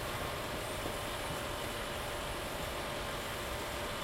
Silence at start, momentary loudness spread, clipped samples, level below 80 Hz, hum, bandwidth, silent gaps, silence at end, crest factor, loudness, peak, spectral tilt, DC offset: 0 s; 1 LU; under 0.1%; -50 dBFS; none; 16 kHz; none; 0 s; 14 dB; -38 LUFS; -26 dBFS; -3.5 dB/octave; under 0.1%